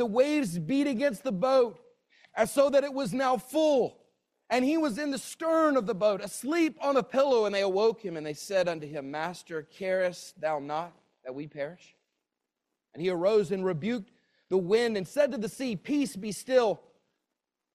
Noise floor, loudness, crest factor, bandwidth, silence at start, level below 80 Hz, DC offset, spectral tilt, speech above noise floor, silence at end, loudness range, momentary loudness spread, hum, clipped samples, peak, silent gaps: -86 dBFS; -28 LUFS; 18 dB; 15 kHz; 0 s; -72 dBFS; under 0.1%; -5 dB/octave; 58 dB; 1 s; 7 LU; 12 LU; none; under 0.1%; -10 dBFS; none